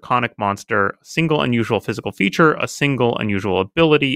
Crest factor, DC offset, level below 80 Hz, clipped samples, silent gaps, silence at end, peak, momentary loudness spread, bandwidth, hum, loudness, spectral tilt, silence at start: 18 dB; under 0.1%; -52 dBFS; under 0.1%; none; 0 s; 0 dBFS; 6 LU; 15.5 kHz; none; -18 LUFS; -5.5 dB/octave; 0.05 s